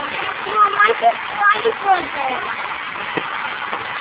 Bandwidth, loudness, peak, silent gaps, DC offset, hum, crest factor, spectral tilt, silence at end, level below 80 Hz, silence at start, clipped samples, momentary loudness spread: 4 kHz; -18 LUFS; -2 dBFS; none; under 0.1%; none; 18 dB; -6 dB/octave; 0 s; -58 dBFS; 0 s; under 0.1%; 10 LU